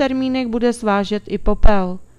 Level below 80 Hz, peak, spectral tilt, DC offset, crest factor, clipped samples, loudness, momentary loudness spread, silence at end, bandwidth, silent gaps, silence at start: -22 dBFS; 0 dBFS; -6.5 dB/octave; under 0.1%; 14 dB; 0.3%; -19 LUFS; 5 LU; 0.15 s; 11 kHz; none; 0 s